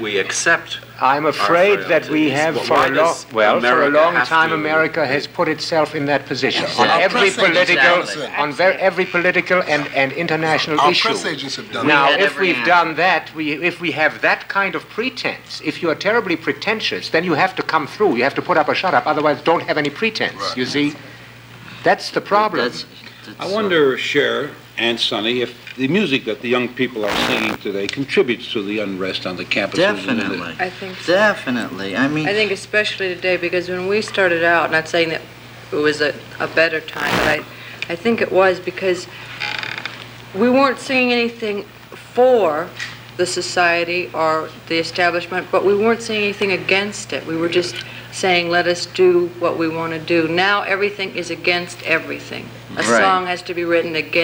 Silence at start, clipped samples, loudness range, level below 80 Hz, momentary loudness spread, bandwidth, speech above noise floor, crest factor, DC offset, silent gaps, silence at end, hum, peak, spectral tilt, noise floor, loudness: 0 s; under 0.1%; 4 LU; -54 dBFS; 10 LU; 17 kHz; 21 dB; 18 dB; under 0.1%; none; 0 s; none; 0 dBFS; -4 dB/octave; -39 dBFS; -17 LUFS